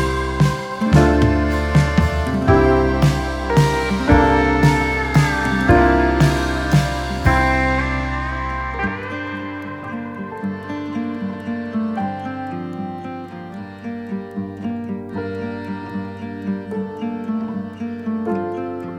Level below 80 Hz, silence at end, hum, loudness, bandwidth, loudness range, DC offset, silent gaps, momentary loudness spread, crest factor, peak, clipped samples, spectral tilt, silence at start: -28 dBFS; 0 s; none; -19 LUFS; 16 kHz; 12 LU; under 0.1%; none; 14 LU; 18 dB; 0 dBFS; under 0.1%; -7 dB/octave; 0 s